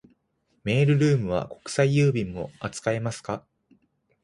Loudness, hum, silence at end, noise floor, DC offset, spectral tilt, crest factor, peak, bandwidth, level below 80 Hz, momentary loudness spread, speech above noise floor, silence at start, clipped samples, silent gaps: -25 LUFS; none; 0.85 s; -71 dBFS; under 0.1%; -6.5 dB/octave; 18 dB; -8 dBFS; 11.5 kHz; -54 dBFS; 13 LU; 47 dB; 0.65 s; under 0.1%; none